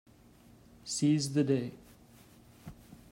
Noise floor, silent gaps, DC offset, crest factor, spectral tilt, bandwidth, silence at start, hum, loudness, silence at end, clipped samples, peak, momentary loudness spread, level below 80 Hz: -59 dBFS; none; under 0.1%; 18 dB; -5.5 dB/octave; 16 kHz; 0.85 s; none; -31 LUFS; 0.15 s; under 0.1%; -18 dBFS; 24 LU; -66 dBFS